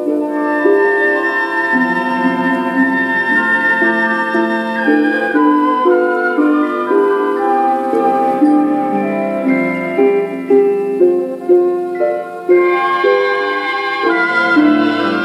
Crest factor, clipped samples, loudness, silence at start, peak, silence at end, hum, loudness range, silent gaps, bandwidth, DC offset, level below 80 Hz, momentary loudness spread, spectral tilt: 14 dB; under 0.1%; -13 LUFS; 0 s; 0 dBFS; 0 s; none; 1 LU; none; 12 kHz; under 0.1%; -74 dBFS; 5 LU; -6.5 dB/octave